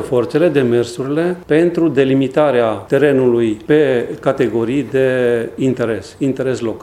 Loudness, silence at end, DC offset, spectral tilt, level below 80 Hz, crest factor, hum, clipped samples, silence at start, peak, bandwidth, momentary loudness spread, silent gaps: -15 LUFS; 0 s; under 0.1%; -7 dB/octave; -50 dBFS; 14 dB; none; under 0.1%; 0 s; 0 dBFS; 13 kHz; 6 LU; none